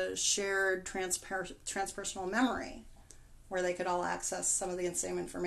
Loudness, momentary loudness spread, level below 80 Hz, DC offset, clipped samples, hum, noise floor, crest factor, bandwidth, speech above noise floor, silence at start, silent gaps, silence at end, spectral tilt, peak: -34 LUFS; 9 LU; -58 dBFS; under 0.1%; under 0.1%; none; -55 dBFS; 18 dB; 12.5 kHz; 20 dB; 0 s; none; 0 s; -2 dB/octave; -18 dBFS